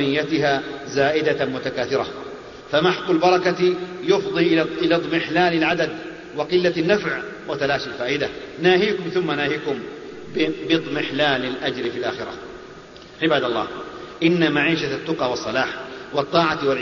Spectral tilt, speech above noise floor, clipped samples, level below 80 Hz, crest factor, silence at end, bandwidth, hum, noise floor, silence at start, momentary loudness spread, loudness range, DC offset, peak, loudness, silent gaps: -5.5 dB/octave; 20 dB; under 0.1%; -54 dBFS; 18 dB; 0 s; 7.2 kHz; none; -41 dBFS; 0 s; 14 LU; 4 LU; under 0.1%; -4 dBFS; -21 LUFS; none